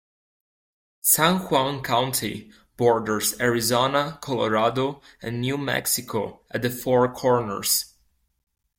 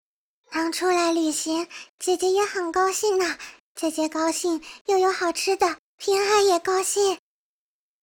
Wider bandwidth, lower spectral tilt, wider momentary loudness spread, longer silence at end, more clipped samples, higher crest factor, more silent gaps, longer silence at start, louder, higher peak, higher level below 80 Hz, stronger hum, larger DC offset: second, 16.5 kHz vs 19 kHz; first, -3.5 dB/octave vs -1 dB/octave; about the same, 10 LU vs 10 LU; about the same, 0.9 s vs 0.85 s; neither; about the same, 20 dB vs 16 dB; second, none vs 1.89-1.98 s, 3.60-3.75 s, 4.81-4.85 s, 5.79-5.98 s; first, 1.05 s vs 0.5 s; about the same, -23 LUFS vs -23 LUFS; first, -4 dBFS vs -8 dBFS; first, -56 dBFS vs -64 dBFS; neither; neither